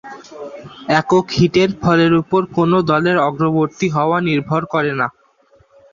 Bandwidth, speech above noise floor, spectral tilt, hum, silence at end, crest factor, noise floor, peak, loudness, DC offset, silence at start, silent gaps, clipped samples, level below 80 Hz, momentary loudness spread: 7.4 kHz; 38 dB; -6.5 dB/octave; none; 0.85 s; 16 dB; -53 dBFS; -2 dBFS; -16 LUFS; under 0.1%; 0.05 s; none; under 0.1%; -50 dBFS; 18 LU